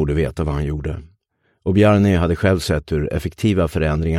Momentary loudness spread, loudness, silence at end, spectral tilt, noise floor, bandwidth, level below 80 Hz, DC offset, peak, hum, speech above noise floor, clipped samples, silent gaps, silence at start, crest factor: 12 LU; -19 LUFS; 0 s; -7 dB/octave; -66 dBFS; 14.5 kHz; -30 dBFS; under 0.1%; -2 dBFS; none; 49 dB; under 0.1%; none; 0 s; 16 dB